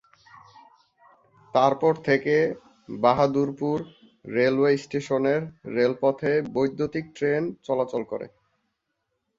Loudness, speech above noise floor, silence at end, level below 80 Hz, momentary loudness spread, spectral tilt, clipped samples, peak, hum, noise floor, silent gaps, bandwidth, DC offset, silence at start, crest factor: -24 LUFS; 55 dB; 1.1 s; -64 dBFS; 10 LU; -7 dB/octave; under 0.1%; -6 dBFS; none; -78 dBFS; none; 7.6 kHz; under 0.1%; 1.55 s; 20 dB